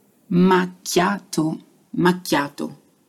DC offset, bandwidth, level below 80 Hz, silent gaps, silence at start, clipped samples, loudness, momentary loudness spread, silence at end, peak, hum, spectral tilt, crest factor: under 0.1%; 15 kHz; -60 dBFS; none; 0.3 s; under 0.1%; -20 LUFS; 15 LU; 0.35 s; -6 dBFS; none; -5.5 dB/octave; 16 dB